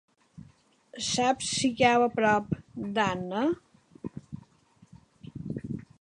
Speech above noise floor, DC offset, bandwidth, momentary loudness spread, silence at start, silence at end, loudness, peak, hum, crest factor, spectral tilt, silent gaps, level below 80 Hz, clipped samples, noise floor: 34 dB; under 0.1%; 11 kHz; 21 LU; 0.95 s; 0.2 s; -27 LUFS; -8 dBFS; none; 22 dB; -4 dB/octave; none; -60 dBFS; under 0.1%; -61 dBFS